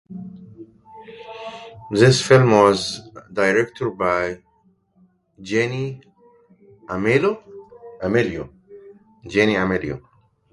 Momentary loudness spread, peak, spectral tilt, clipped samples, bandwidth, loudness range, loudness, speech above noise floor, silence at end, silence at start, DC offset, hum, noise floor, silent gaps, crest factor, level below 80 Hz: 24 LU; 0 dBFS; -5.5 dB/octave; under 0.1%; 11.5 kHz; 7 LU; -19 LUFS; 43 dB; 0.55 s; 0.1 s; under 0.1%; none; -61 dBFS; none; 22 dB; -52 dBFS